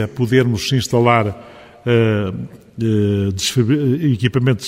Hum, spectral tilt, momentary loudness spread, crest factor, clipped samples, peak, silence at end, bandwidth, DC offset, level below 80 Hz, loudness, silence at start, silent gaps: none; -6 dB/octave; 10 LU; 16 dB; under 0.1%; 0 dBFS; 0 s; 15.5 kHz; under 0.1%; -48 dBFS; -17 LUFS; 0 s; none